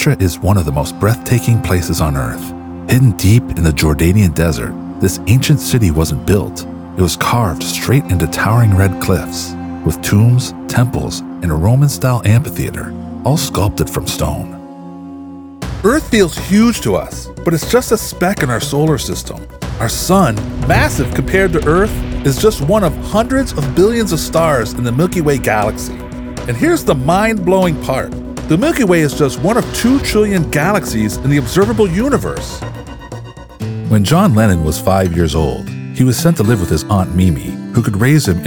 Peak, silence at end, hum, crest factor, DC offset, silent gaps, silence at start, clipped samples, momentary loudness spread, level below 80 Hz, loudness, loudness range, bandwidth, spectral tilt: 0 dBFS; 0 s; none; 12 dB; under 0.1%; none; 0 s; under 0.1%; 13 LU; -28 dBFS; -14 LUFS; 3 LU; over 20 kHz; -6 dB/octave